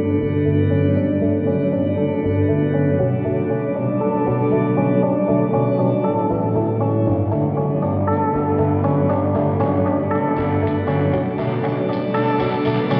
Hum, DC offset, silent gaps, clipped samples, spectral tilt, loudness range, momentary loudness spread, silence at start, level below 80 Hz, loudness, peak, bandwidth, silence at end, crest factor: none; under 0.1%; none; under 0.1%; -8.5 dB/octave; 1 LU; 3 LU; 0 s; -46 dBFS; -19 LUFS; -6 dBFS; 5.2 kHz; 0 s; 12 dB